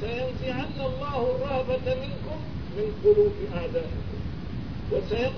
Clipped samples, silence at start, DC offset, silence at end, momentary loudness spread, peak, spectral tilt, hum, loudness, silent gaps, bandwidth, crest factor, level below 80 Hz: under 0.1%; 0 s; 1%; 0 s; 13 LU; -10 dBFS; -8 dB/octave; none; -28 LUFS; none; 5.4 kHz; 18 dB; -40 dBFS